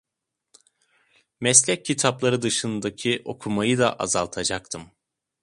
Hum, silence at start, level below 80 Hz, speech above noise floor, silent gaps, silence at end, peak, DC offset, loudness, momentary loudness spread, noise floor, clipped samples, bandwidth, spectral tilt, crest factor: none; 1.4 s; -58 dBFS; 60 dB; none; 0.6 s; 0 dBFS; under 0.1%; -22 LUFS; 12 LU; -84 dBFS; under 0.1%; 11.5 kHz; -3 dB/octave; 24 dB